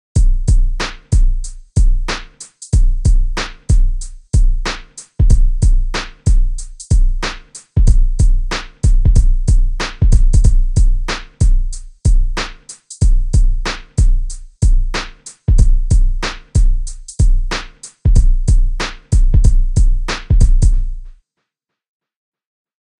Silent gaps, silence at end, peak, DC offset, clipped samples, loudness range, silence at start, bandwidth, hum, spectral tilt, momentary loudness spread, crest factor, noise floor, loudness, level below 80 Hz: none; 1.9 s; 0 dBFS; under 0.1%; 0.2%; 3 LU; 0.15 s; 10 kHz; none; -5 dB/octave; 10 LU; 12 dB; -77 dBFS; -17 LUFS; -12 dBFS